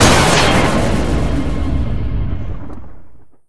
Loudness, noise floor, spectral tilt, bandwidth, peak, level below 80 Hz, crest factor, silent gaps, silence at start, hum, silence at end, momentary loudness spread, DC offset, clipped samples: -15 LUFS; -37 dBFS; -4.5 dB/octave; 11 kHz; 0 dBFS; -22 dBFS; 16 dB; none; 0 s; none; 0 s; 18 LU; 9%; under 0.1%